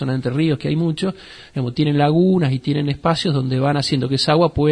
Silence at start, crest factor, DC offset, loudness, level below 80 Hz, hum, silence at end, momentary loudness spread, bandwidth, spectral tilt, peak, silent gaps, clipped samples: 0 s; 14 dB; under 0.1%; -18 LUFS; -46 dBFS; none; 0 s; 9 LU; 10.5 kHz; -7 dB/octave; -4 dBFS; none; under 0.1%